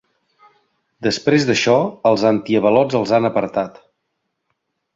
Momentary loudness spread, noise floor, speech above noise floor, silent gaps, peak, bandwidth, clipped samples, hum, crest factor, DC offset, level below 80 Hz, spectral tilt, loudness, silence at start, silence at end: 8 LU; -74 dBFS; 58 dB; none; 0 dBFS; 7.8 kHz; under 0.1%; none; 18 dB; under 0.1%; -58 dBFS; -5.5 dB/octave; -17 LUFS; 1 s; 1.25 s